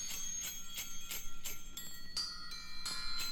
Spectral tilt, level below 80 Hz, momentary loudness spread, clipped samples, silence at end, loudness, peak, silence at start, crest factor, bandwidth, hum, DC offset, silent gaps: 0.5 dB/octave; -50 dBFS; 7 LU; under 0.1%; 0 s; -42 LUFS; -26 dBFS; 0 s; 12 dB; 18 kHz; none; under 0.1%; none